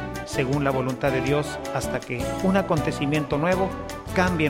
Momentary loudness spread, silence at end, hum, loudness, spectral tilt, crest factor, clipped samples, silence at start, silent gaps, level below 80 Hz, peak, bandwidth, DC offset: 6 LU; 0 s; none; -25 LUFS; -6 dB/octave; 18 dB; under 0.1%; 0 s; none; -42 dBFS; -6 dBFS; 16.5 kHz; under 0.1%